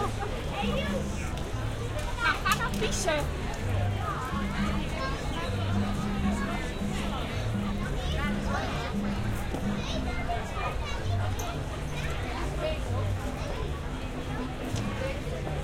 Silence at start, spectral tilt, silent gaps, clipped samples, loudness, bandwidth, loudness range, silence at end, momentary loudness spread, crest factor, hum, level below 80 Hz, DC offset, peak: 0 s; -5.5 dB/octave; none; under 0.1%; -31 LUFS; 16.5 kHz; 3 LU; 0 s; 6 LU; 18 dB; none; -36 dBFS; under 0.1%; -12 dBFS